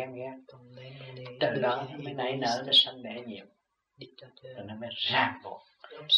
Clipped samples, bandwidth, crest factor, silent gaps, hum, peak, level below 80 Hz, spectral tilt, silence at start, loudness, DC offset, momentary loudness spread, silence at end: under 0.1%; 11.5 kHz; 20 dB; none; none; -12 dBFS; -76 dBFS; -4 dB/octave; 0 s; -28 LUFS; under 0.1%; 27 LU; 0 s